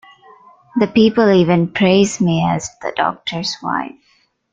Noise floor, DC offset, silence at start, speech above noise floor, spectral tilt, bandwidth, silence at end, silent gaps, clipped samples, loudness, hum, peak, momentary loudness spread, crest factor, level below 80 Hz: -59 dBFS; under 0.1%; 0.75 s; 44 dB; -5.5 dB/octave; 9.2 kHz; 0.65 s; none; under 0.1%; -16 LUFS; none; -2 dBFS; 11 LU; 16 dB; -52 dBFS